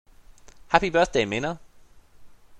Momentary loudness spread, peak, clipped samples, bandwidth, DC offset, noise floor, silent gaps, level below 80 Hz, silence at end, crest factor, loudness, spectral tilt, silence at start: 11 LU; 0 dBFS; under 0.1%; 11 kHz; under 0.1%; -51 dBFS; none; -48 dBFS; 0 s; 26 dB; -23 LUFS; -4.5 dB/octave; 0.7 s